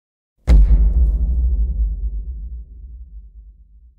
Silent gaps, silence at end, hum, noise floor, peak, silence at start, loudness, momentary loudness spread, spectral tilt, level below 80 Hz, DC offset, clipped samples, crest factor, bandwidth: none; 0.5 s; none; -45 dBFS; -4 dBFS; 0.45 s; -19 LUFS; 24 LU; -9 dB/octave; -18 dBFS; under 0.1%; under 0.1%; 14 dB; 4.3 kHz